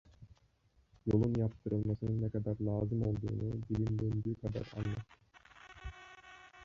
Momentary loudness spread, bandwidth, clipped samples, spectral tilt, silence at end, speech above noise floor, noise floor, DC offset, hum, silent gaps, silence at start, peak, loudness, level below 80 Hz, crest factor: 20 LU; 7 kHz; under 0.1%; -9.5 dB/octave; 0 s; 36 dB; -71 dBFS; under 0.1%; none; none; 0.2 s; -16 dBFS; -37 LUFS; -54 dBFS; 20 dB